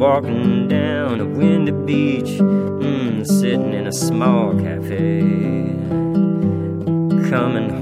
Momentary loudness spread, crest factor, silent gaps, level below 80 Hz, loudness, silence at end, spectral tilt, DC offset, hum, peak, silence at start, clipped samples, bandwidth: 5 LU; 16 dB; none; -54 dBFS; -18 LUFS; 0 s; -7 dB/octave; under 0.1%; none; -2 dBFS; 0 s; under 0.1%; 15 kHz